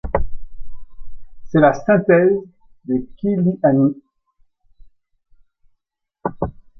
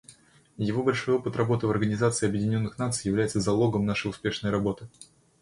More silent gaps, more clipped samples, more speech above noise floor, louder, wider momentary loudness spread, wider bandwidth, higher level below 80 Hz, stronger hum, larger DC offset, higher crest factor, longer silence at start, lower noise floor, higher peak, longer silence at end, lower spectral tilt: neither; neither; first, 59 dB vs 29 dB; first, -18 LUFS vs -27 LUFS; first, 15 LU vs 6 LU; second, 6.2 kHz vs 11.5 kHz; first, -38 dBFS vs -54 dBFS; neither; neither; about the same, 18 dB vs 18 dB; about the same, 0.05 s vs 0.1 s; first, -75 dBFS vs -55 dBFS; first, -2 dBFS vs -10 dBFS; about the same, 0.3 s vs 0.4 s; first, -9.5 dB/octave vs -5.5 dB/octave